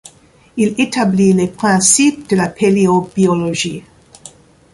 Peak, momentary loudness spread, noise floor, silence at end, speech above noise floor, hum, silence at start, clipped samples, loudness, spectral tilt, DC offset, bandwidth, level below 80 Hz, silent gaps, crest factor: 0 dBFS; 9 LU; -47 dBFS; 0.45 s; 34 dB; none; 0.55 s; under 0.1%; -13 LUFS; -4.5 dB/octave; under 0.1%; 11.5 kHz; -50 dBFS; none; 14 dB